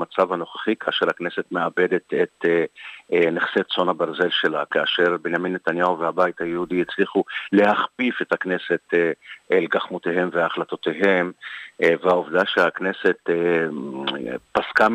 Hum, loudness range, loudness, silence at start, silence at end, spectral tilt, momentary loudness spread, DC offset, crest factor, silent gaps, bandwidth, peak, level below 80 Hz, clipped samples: none; 1 LU; -22 LUFS; 0 s; 0 s; -6 dB/octave; 7 LU; under 0.1%; 16 dB; none; 9.2 kHz; -6 dBFS; -66 dBFS; under 0.1%